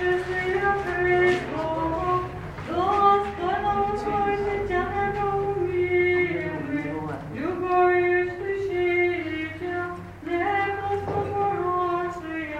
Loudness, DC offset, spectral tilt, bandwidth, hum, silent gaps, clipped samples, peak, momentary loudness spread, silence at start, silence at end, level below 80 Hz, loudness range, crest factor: -25 LUFS; under 0.1%; -7 dB/octave; 9.2 kHz; none; none; under 0.1%; -8 dBFS; 10 LU; 0 s; 0 s; -46 dBFS; 3 LU; 16 dB